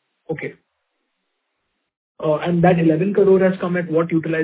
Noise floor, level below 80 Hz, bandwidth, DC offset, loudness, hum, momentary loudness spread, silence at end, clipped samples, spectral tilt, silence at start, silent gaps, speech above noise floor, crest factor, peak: -74 dBFS; -56 dBFS; 4 kHz; under 0.1%; -17 LUFS; none; 14 LU; 0 s; under 0.1%; -12 dB/octave; 0.3 s; 1.97-2.15 s; 57 dB; 18 dB; -2 dBFS